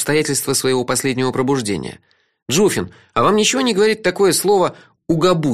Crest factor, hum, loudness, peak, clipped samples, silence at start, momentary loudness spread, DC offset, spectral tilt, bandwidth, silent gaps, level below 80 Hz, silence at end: 14 dB; none; -17 LUFS; -2 dBFS; under 0.1%; 0 s; 8 LU; 0.4%; -4 dB/octave; 15.5 kHz; 2.42-2.46 s; -50 dBFS; 0 s